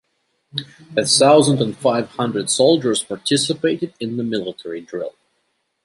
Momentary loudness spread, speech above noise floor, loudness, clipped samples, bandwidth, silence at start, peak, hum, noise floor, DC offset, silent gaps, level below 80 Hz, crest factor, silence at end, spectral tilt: 16 LU; 51 dB; -18 LUFS; under 0.1%; 12 kHz; 0.55 s; -2 dBFS; none; -69 dBFS; under 0.1%; none; -64 dBFS; 18 dB; 0.75 s; -4 dB/octave